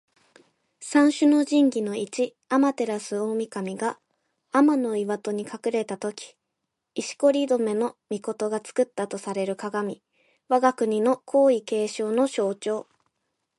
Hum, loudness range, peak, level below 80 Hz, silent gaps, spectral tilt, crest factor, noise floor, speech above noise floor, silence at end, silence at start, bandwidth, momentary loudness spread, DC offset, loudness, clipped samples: none; 4 LU; -8 dBFS; -78 dBFS; none; -5 dB/octave; 16 dB; -81 dBFS; 58 dB; 0.75 s; 0.8 s; 11.5 kHz; 12 LU; under 0.1%; -25 LUFS; under 0.1%